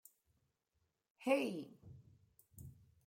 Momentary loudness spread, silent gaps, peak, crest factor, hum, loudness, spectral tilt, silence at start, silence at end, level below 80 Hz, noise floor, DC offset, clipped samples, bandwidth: 24 LU; none; -22 dBFS; 24 dB; none; -39 LUFS; -5.5 dB/octave; 1.2 s; 0.35 s; -76 dBFS; -85 dBFS; under 0.1%; under 0.1%; 16.5 kHz